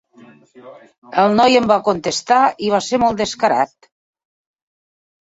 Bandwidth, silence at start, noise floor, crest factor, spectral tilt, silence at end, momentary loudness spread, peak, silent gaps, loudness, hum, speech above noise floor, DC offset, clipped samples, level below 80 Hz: 8 kHz; 0.65 s; -46 dBFS; 16 dB; -4 dB/octave; 1.55 s; 7 LU; -2 dBFS; 0.98-1.02 s; -16 LUFS; none; 30 dB; under 0.1%; under 0.1%; -54 dBFS